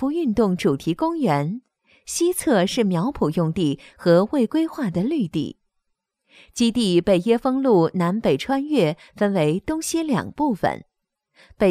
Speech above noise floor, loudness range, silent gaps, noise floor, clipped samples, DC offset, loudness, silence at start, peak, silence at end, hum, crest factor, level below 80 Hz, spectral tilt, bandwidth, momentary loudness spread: 55 dB; 3 LU; none; -75 dBFS; under 0.1%; under 0.1%; -21 LUFS; 0 s; -4 dBFS; 0 s; none; 18 dB; -52 dBFS; -6 dB/octave; 15.5 kHz; 7 LU